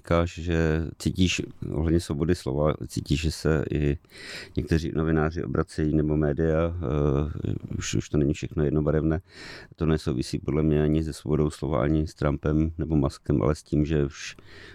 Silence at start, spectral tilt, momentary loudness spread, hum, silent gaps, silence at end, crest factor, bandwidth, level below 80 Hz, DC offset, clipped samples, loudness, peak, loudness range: 0.05 s; -6.5 dB/octave; 8 LU; none; none; 0 s; 16 dB; 13 kHz; -36 dBFS; under 0.1%; under 0.1%; -26 LUFS; -10 dBFS; 2 LU